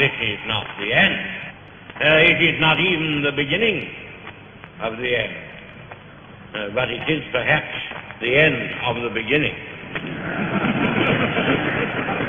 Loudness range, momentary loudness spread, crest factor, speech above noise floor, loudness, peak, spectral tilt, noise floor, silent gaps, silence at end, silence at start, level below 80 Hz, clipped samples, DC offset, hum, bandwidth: 8 LU; 20 LU; 20 dB; 21 dB; -19 LUFS; -2 dBFS; -7 dB/octave; -41 dBFS; none; 0 s; 0 s; -48 dBFS; under 0.1%; under 0.1%; none; 7.4 kHz